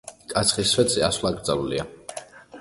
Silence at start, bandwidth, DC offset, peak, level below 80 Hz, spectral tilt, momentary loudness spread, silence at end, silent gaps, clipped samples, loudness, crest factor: 0.05 s; 12 kHz; under 0.1%; -4 dBFS; -48 dBFS; -3 dB/octave; 18 LU; 0 s; none; under 0.1%; -22 LUFS; 20 dB